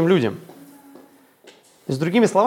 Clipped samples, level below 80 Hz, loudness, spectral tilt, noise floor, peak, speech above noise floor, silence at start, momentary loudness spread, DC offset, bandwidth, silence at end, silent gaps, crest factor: under 0.1%; -70 dBFS; -21 LUFS; -6.5 dB/octave; -51 dBFS; -2 dBFS; 33 dB; 0 s; 20 LU; under 0.1%; 17 kHz; 0 s; none; 18 dB